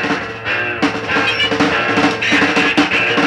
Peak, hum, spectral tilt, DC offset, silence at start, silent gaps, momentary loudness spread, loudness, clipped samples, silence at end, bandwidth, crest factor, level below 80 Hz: -2 dBFS; none; -4 dB/octave; under 0.1%; 0 s; none; 6 LU; -14 LUFS; under 0.1%; 0 s; 11.5 kHz; 14 dB; -46 dBFS